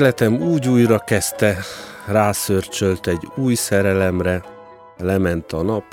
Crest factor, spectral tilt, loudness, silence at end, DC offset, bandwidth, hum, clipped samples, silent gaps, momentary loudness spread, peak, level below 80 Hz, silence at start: 16 dB; -5.5 dB/octave; -19 LUFS; 0.1 s; under 0.1%; 17.5 kHz; none; under 0.1%; none; 8 LU; -2 dBFS; -46 dBFS; 0 s